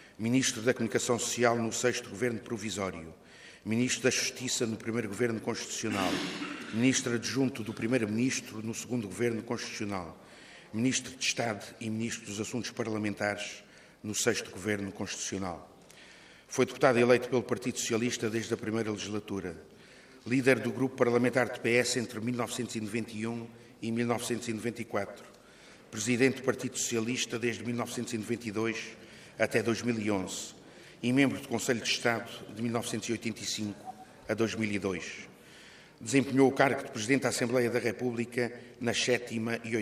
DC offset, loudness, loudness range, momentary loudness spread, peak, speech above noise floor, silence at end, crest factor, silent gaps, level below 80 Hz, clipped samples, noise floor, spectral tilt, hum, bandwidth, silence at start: under 0.1%; -31 LUFS; 5 LU; 14 LU; -10 dBFS; 24 dB; 0 s; 22 dB; none; -70 dBFS; under 0.1%; -55 dBFS; -4 dB/octave; none; 15.5 kHz; 0 s